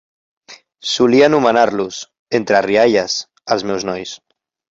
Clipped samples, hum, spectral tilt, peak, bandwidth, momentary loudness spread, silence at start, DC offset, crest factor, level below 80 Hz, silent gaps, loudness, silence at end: under 0.1%; none; -4 dB/octave; 0 dBFS; 7.8 kHz; 15 LU; 0.5 s; under 0.1%; 16 dB; -56 dBFS; 2.19-2.26 s; -15 LUFS; 0.55 s